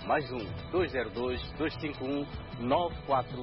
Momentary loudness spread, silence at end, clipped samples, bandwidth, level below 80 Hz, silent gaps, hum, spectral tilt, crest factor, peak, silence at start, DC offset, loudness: 7 LU; 0 s; under 0.1%; 5.8 kHz; -48 dBFS; none; none; -10 dB/octave; 18 dB; -14 dBFS; 0 s; under 0.1%; -33 LUFS